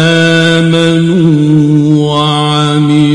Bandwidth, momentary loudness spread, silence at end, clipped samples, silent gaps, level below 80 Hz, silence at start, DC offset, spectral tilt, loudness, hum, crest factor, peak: 11 kHz; 2 LU; 0 s; 0.2%; none; -42 dBFS; 0 s; under 0.1%; -6 dB/octave; -8 LUFS; none; 8 dB; 0 dBFS